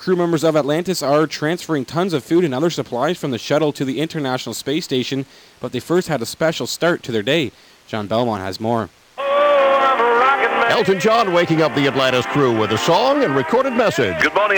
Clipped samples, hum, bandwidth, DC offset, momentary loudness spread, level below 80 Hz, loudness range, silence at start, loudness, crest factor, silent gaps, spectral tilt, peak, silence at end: under 0.1%; none; 19 kHz; under 0.1%; 9 LU; -56 dBFS; 6 LU; 0 s; -18 LUFS; 12 dB; none; -5 dB/octave; -6 dBFS; 0 s